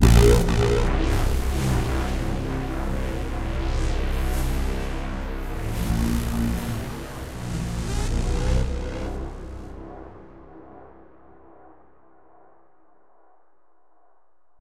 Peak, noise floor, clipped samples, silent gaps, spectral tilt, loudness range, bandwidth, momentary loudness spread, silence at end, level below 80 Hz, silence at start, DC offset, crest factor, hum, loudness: -2 dBFS; -67 dBFS; under 0.1%; none; -6 dB/octave; 14 LU; 16 kHz; 18 LU; 3.7 s; -26 dBFS; 0 s; under 0.1%; 22 dB; none; -26 LUFS